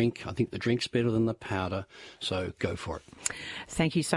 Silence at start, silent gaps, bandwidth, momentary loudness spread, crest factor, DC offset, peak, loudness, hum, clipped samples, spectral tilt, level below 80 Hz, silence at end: 0 s; none; 11.5 kHz; 10 LU; 24 dB; under 0.1%; -8 dBFS; -31 LUFS; none; under 0.1%; -5 dB/octave; -56 dBFS; 0 s